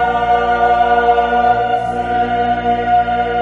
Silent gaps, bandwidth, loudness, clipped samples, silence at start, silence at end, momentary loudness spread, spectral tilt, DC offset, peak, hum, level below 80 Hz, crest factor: none; 7 kHz; -14 LUFS; under 0.1%; 0 s; 0 s; 5 LU; -6 dB/octave; under 0.1%; -2 dBFS; 60 Hz at -30 dBFS; -36 dBFS; 12 dB